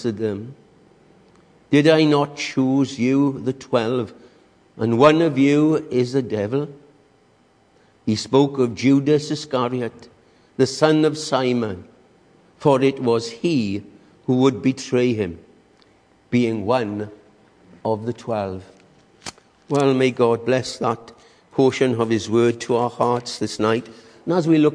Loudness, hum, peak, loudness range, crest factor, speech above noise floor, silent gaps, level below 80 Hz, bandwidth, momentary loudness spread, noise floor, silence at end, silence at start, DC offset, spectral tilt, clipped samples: -20 LUFS; none; -2 dBFS; 5 LU; 20 dB; 38 dB; none; -62 dBFS; 10.5 kHz; 14 LU; -57 dBFS; 0 s; 0 s; under 0.1%; -6 dB/octave; under 0.1%